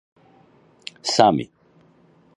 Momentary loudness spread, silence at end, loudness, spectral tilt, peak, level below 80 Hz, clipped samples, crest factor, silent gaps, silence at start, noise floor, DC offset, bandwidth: 22 LU; 0.9 s; -19 LUFS; -4 dB/octave; 0 dBFS; -62 dBFS; under 0.1%; 24 dB; none; 1.05 s; -56 dBFS; under 0.1%; 11 kHz